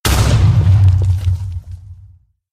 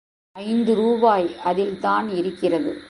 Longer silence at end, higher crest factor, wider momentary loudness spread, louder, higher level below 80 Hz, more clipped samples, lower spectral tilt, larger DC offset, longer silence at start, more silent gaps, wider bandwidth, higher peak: first, 0.6 s vs 0 s; second, 12 dB vs 18 dB; first, 20 LU vs 7 LU; first, -13 LUFS vs -21 LUFS; first, -22 dBFS vs -60 dBFS; neither; second, -5.5 dB/octave vs -7 dB/octave; neither; second, 0.05 s vs 0.35 s; neither; first, 15 kHz vs 11 kHz; about the same, -2 dBFS vs -4 dBFS